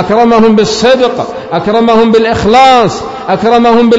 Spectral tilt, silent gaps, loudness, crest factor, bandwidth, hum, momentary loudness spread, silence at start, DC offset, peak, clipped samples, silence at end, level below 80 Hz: -5 dB/octave; none; -7 LUFS; 6 dB; 8 kHz; none; 9 LU; 0 s; under 0.1%; 0 dBFS; 2%; 0 s; -36 dBFS